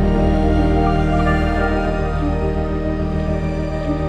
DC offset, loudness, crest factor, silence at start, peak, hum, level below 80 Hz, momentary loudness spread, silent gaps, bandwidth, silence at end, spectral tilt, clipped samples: under 0.1%; -19 LUFS; 12 dB; 0 s; -6 dBFS; none; -22 dBFS; 5 LU; none; 9 kHz; 0 s; -8.5 dB/octave; under 0.1%